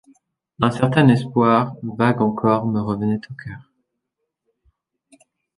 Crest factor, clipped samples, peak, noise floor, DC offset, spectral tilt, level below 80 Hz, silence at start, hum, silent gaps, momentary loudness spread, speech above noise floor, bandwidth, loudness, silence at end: 20 dB; under 0.1%; -2 dBFS; -79 dBFS; under 0.1%; -8 dB/octave; -54 dBFS; 0.6 s; none; none; 18 LU; 60 dB; 11 kHz; -19 LUFS; 2 s